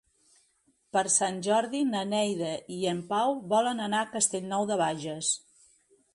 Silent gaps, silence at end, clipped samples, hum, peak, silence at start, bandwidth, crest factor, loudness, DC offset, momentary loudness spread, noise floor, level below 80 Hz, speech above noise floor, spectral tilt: none; 0.75 s; under 0.1%; none; -10 dBFS; 0.95 s; 11.5 kHz; 20 dB; -28 LUFS; under 0.1%; 6 LU; -70 dBFS; -74 dBFS; 41 dB; -3 dB/octave